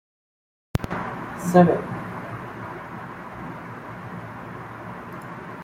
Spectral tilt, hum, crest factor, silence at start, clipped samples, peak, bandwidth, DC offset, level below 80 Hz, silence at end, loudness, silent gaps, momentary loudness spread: -7.5 dB/octave; none; 24 dB; 0.75 s; under 0.1%; -2 dBFS; 15.5 kHz; under 0.1%; -50 dBFS; 0 s; -27 LUFS; none; 18 LU